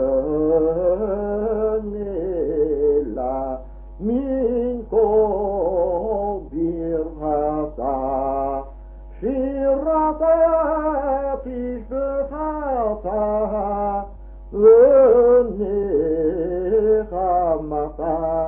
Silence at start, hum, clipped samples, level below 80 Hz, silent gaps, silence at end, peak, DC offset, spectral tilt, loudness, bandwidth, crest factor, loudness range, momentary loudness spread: 0 s; none; under 0.1%; -38 dBFS; none; 0 s; -4 dBFS; under 0.1%; -12.5 dB/octave; -20 LUFS; 3 kHz; 16 dB; 7 LU; 10 LU